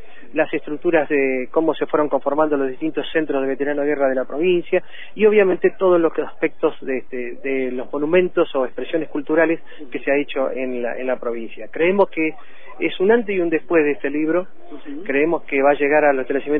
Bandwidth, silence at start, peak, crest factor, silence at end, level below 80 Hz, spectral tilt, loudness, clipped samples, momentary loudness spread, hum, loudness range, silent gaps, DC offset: 3.8 kHz; 0.35 s; -4 dBFS; 16 dB; 0 s; -56 dBFS; -10 dB/octave; -20 LUFS; under 0.1%; 9 LU; none; 3 LU; none; 4%